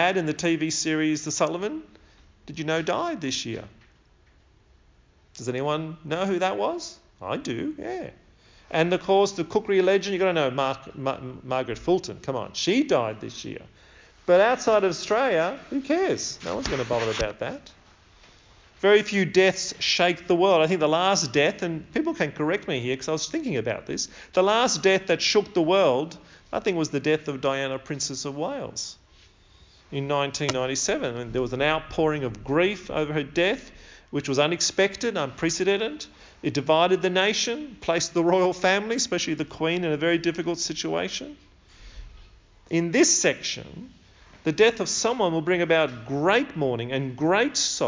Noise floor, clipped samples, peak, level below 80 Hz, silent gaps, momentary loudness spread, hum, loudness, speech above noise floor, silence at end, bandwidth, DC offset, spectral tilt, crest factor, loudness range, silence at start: -58 dBFS; under 0.1%; -6 dBFS; -54 dBFS; none; 12 LU; none; -24 LUFS; 34 dB; 0 s; 7.6 kHz; under 0.1%; -3.5 dB/octave; 18 dB; 7 LU; 0 s